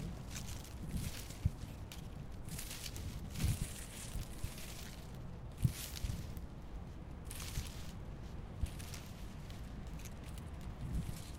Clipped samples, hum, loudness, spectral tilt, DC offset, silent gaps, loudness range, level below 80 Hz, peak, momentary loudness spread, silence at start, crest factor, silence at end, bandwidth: under 0.1%; none; -45 LUFS; -4.5 dB/octave; under 0.1%; none; 4 LU; -48 dBFS; -18 dBFS; 11 LU; 0 s; 24 dB; 0 s; 17.5 kHz